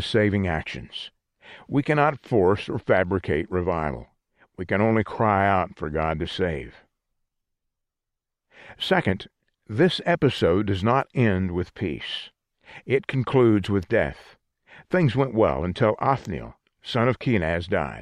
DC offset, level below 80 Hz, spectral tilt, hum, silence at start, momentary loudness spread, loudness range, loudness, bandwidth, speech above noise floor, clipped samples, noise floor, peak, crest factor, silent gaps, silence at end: under 0.1%; -46 dBFS; -7.5 dB/octave; none; 0 s; 13 LU; 5 LU; -24 LUFS; 11 kHz; 61 dB; under 0.1%; -85 dBFS; -6 dBFS; 18 dB; none; 0 s